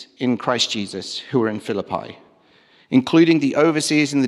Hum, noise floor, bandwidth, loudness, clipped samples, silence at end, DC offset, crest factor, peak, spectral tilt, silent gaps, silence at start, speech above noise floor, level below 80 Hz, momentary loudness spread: none; -54 dBFS; 12.5 kHz; -19 LUFS; under 0.1%; 0 s; under 0.1%; 16 dB; -4 dBFS; -4.5 dB/octave; none; 0 s; 35 dB; -68 dBFS; 13 LU